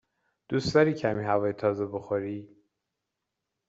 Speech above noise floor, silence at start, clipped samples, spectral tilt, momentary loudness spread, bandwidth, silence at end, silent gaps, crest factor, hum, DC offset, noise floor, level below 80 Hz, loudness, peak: 58 dB; 0.5 s; under 0.1%; -5.5 dB/octave; 9 LU; 8 kHz; 1.25 s; none; 20 dB; none; under 0.1%; -85 dBFS; -60 dBFS; -28 LUFS; -8 dBFS